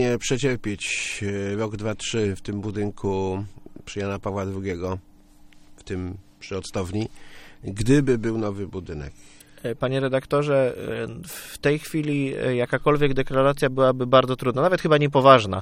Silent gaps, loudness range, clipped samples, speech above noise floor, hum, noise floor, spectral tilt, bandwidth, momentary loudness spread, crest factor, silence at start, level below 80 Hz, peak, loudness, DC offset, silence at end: none; 10 LU; under 0.1%; 26 dB; none; -49 dBFS; -5.5 dB/octave; 16 kHz; 15 LU; 24 dB; 0 s; -44 dBFS; 0 dBFS; -23 LUFS; under 0.1%; 0 s